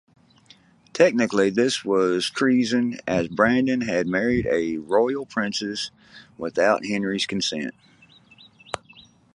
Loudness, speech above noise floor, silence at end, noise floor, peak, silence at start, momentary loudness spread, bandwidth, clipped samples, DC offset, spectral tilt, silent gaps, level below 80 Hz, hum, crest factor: -22 LUFS; 32 dB; 0.6 s; -54 dBFS; -2 dBFS; 0.95 s; 13 LU; 11.5 kHz; under 0.1%; under 0.1%; -4.5 dB/octave; none; -54 dBFS; none; 20 dB